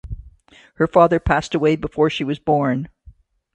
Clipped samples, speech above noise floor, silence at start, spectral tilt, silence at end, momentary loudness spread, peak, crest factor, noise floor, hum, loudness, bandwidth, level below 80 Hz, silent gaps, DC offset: under 0.1%; 31 dB; 0.05 s; -7 dB/octave; 0.45 s; 16 LU; 0 dBFS; 20 dB; -48 dBFS; none; -19 LUFS; 9.2 kHz; -38 dBFS; none; under 0.1%